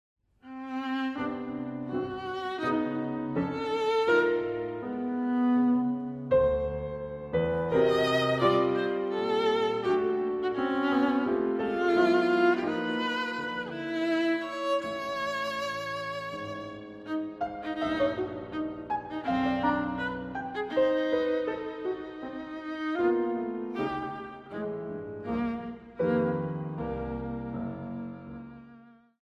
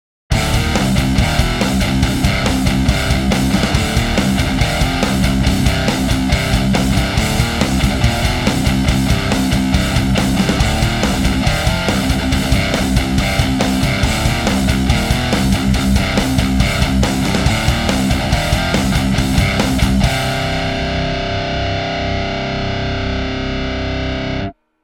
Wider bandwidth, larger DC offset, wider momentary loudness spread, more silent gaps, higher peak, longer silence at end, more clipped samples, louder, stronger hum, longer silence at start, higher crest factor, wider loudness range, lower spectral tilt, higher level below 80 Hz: second, 12.5 kHz vs 18 kHz; neither; first, 13 LU vs 4 LU; neither; second, -12 dBFS vs 0 dBFS; first, 0.45 s vs 0.3 s; neither; second, -30 LUFS vs -16 LUFS; neither; first, 0.45 s vs 0.3 s; about the same, 18 dB vs 14 dB; first, 6 LU vs 2 LU; first, -6.5 dB/octave vs -5 dB/octave; second, -54 dBFS vs -22 dBFS